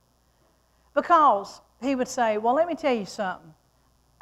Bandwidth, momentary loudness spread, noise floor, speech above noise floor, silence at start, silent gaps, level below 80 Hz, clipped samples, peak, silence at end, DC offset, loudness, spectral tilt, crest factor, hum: 13.5 kHz; 14 LU; -64 dBFS; 41 dB; 0.95 s; none; -64 dBFS; under 0.1%; -8 dBFS; 0.85 s; under 0.1%; -24 LUFS; -4 dB/octave; 18 dB; none